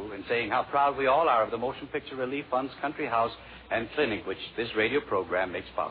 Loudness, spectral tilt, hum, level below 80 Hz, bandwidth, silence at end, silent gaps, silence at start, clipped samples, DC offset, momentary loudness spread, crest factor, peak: -29 LUFS; -2.5 dB/octave; none; -58 dBFS; 5 kHz; 0 s; none; 0 s; under 0.1%; under 0.1%; 9 LU; 16 dB; -12 dBFS